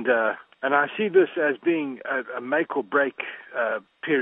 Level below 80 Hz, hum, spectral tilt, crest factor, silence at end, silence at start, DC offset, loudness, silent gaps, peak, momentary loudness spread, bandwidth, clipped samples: -82 dBFS; none; -9 dB/octave; 20 dB; 0 s; 0 s; under 0.1%; -25 LUFS; none; -6 dBFS; 8 LU; 3.9 kHz; under 0.1%